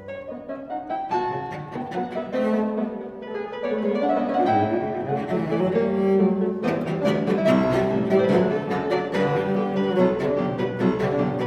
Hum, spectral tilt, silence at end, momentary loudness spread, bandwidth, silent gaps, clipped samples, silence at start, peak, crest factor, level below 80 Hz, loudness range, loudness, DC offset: none; -8 dB/octave; 0 s; 11 LU; 10.5 kHz; none; under 0.1%; 0 s; -8 dBFS; 16 dB; -56 dBFS; 6 LU; -23 LUFS; under 0.1%